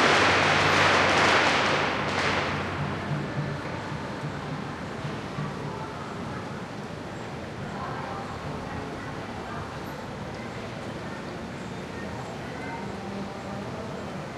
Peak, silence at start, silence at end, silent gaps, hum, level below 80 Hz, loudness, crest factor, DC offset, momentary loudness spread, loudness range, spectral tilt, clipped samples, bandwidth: -8 dBFS; 0 s; 0 s; none; none; -52 dBFS; -28 LUFS; 20 dB; under 0.1%; 16 LU; 12 LU; -4 dB/octave; under 0.1%; 13.5 kHz